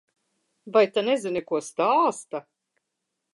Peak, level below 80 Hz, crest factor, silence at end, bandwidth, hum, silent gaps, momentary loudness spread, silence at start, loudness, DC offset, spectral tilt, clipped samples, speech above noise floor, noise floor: -8 dBFS; -74 dBFS; 18 dB; 0.95 s; 11.5 kHz; none; none; 14 LU; 0.65 s; -24 LUFS; under 0.1%; -4 dB/octave; under 0.1%; 58 dB; -81 dBFS